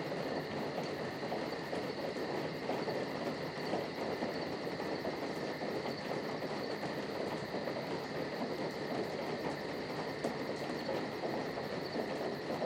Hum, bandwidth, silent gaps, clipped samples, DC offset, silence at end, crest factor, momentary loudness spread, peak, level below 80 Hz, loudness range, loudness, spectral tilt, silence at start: none; 17 kHz; none; under 0.1%; under 0.1%; 0 s; 18 dB; 1 LU; -22 dBFS; -70 dBFS; 1 LU; -39 LUFS; -5.5 dB/octave; 0 s